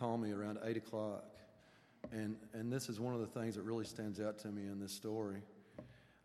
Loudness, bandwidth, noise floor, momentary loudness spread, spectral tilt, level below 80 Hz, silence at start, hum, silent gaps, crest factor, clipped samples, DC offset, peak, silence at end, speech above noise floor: -44 LUFS; 14 kHz; -67 dBFS; 16 LU; -6 dB/octave; -78 dBFS; 0 s; none; none; 18 dB; under 0.1%; under 0.1%; -26 dBFS; 0.2 s; 24 dB